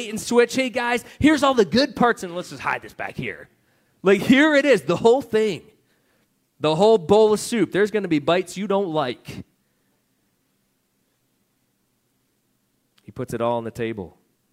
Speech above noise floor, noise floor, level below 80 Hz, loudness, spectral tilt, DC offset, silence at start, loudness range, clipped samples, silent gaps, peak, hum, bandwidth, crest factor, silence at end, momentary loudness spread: 49 dB; -69 dBFS; -56 dBFS; -20 LUFS; -5 dB/octave; under 0.1%; 0 s; 12 LU; under 0.1%; none; -2 dBFS; none; 16 kHz; 18 dB; 0.45 s; 16 LU